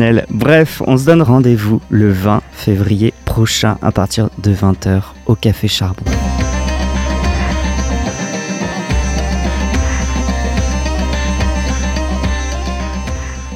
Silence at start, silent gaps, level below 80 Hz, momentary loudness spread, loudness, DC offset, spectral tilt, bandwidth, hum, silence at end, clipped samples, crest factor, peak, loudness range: 0 s; none; -20 dBFS; 9 LU; -15 LUFS; under 0.1%; -5.5 dB/octave; 15.5 kHz; none; 0 s; under 0.1%; 14 dB; 0 dBFS; 5 LU